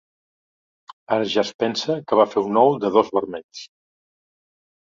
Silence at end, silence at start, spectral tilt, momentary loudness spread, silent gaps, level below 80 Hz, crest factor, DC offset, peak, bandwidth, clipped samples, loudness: 1.3 s; 1.1 s; -5 dB/octave; 15 LU; 1.54-1.59 s, 3.44-3.49 s; -66 dBFS; 20 dB; under 0.1%; -2 dBFS; 7.6 kHz; under 0.1%; -20 LUFS